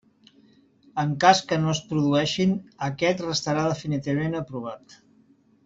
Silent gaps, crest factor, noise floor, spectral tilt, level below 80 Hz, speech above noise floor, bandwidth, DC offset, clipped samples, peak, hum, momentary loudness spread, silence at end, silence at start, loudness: none; 22 dB; -59 dBFS; -5 dB/octave; -60 dBFS; 35 dB; 7.8 kHz; under 0.1%; under 0.1%; -4 dBFS; none; 15 LU; 0.9 s; 0.95 s; -24 LUFS